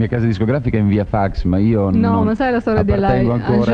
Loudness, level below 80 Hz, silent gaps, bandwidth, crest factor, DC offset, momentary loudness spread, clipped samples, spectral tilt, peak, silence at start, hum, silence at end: -16 LUFS; -30 dBFS; none; 6.8 kHz; 12 dB; under 0.1%; 3 LU; under 0.1%; -9.5 dB/octave; -4 dBFS; 0 s; none; 0 s